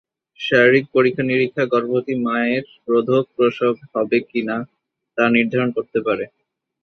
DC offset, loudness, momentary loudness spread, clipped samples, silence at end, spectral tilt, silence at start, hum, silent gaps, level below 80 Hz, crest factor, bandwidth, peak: under 0.1%; -19 LUFS; 10 LU; under 0.1%; 0.55 s; -7.5 dB/octave; 0.4 s; none; none; -62 dBFS; 18 dB; 6.4 kHz; -2 dBFS